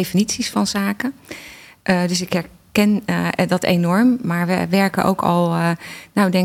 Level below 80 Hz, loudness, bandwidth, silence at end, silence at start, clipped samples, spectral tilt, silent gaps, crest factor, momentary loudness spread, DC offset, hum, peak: -54 dBFS; -19 LUFS; 16.5 kHz; 0 s; 0 s; under 0.1%; -5.5 dB/octave; none; 16 dB; 10 LU; under 0.1%; none; -4 dBFS